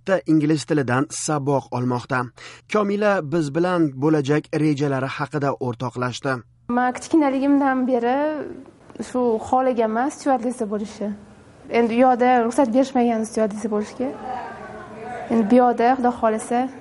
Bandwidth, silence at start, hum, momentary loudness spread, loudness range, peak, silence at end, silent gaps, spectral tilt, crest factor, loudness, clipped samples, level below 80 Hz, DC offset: 11.5 kHz; 0.05 s; none; 13 LU; 2 LU; -4 dBFS; 0 s; none; -6 dB/octave; 16 dB; -21 LUFS; under 0.1%; -58 dBFS; under 0.1%